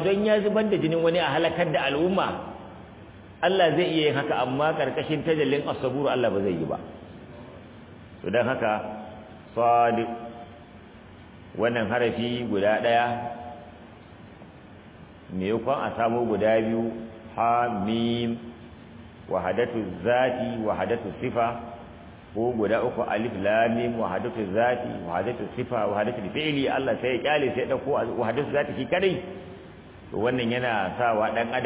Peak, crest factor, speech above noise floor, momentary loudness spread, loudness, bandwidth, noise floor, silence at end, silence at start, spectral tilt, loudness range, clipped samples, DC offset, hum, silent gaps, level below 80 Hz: -8 dBFS; 18 dB; 22 dB; 21 LU; -25 LUFS; 4 kHz; -47 dBFS; 0 s; 0 s; -10 dB/octave; 3 LU; under 0.1%; under 0.1%; none; none; -54 dBFS